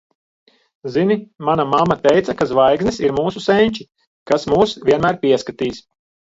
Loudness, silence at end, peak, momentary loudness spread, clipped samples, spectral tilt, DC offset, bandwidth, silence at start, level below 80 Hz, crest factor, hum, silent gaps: -17 LUFS; 0.5 s; 0 dBFS; 9 LU; under 0.1%; -6 dB/octave; under 0.1%; 7.8 kHz; 0.85 s; -48 dBFS; 16 dB; none; 4.07-4.26 s